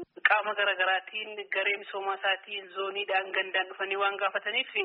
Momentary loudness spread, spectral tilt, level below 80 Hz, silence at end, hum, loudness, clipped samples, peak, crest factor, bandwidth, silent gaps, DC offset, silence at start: 9 LU; 3 dB/octave; -86 dBFS; 0 s; none; -29 LUFS; under 0.1%; -6 dBFS; 24 dB; 5.2 kHz; none; under 0.1%; 0 s